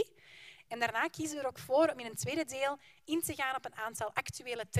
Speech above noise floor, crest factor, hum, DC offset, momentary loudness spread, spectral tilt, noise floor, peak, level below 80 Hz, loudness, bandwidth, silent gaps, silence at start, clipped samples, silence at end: 21 dB; 22 dB; none; under 0.1%; 14 LU; -4 dB/octave; -57 dBFS; -14 dBFS; -70 dBFS; -35 LUFS; 15.5 kHz; none; 0 s; under 0.1%; 0 s